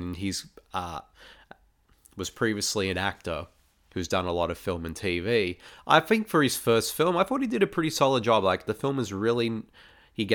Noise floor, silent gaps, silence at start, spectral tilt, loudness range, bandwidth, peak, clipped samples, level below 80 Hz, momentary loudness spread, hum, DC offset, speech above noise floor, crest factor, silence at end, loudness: -61 dBFS; none; 0 s; -4.5 dB/octave; 8 LU; 19 kHz; -4 dBFS; under 0.1%; -54 dBFS; 14 LU; none; under 0.1%; 34 dB; 24 dB; 0 s; -27 LUFS